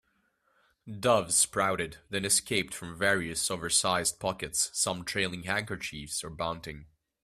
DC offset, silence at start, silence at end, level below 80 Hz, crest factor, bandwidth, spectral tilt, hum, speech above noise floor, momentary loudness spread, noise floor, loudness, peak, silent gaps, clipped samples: under 0.1%; 0.85 s; 0.4 s; -60 dBFS; 20 dB; 15.5 kHz; -2 dB/octave; none; 42 dB; 12 LU; -73 dBFS; -29 LUFS; -10 dBFS; none; under 0.1%